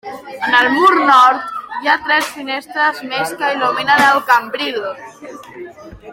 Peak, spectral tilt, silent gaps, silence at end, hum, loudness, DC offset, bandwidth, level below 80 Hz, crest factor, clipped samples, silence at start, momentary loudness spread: 0 dBFS; -2.5 dB/octave; none; 0 s; none; -14 LUFS; under 0.1%; 16.5 kHz; -54 dBFS; 16 dB; under 0.1%; 0.05 s; 23 LU